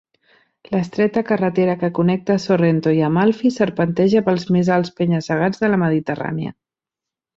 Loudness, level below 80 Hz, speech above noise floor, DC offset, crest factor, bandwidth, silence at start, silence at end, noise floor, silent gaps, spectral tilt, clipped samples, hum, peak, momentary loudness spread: -18 LUFS; -56 dBFS; 69 dB; under 0.1%; 14 dB; 7.6 kHz; 0.7 s; 0.85 s; -87 dBFS; none; -7.5 dB/octave; under 0.1%; none; -4 dBFS; 7 LU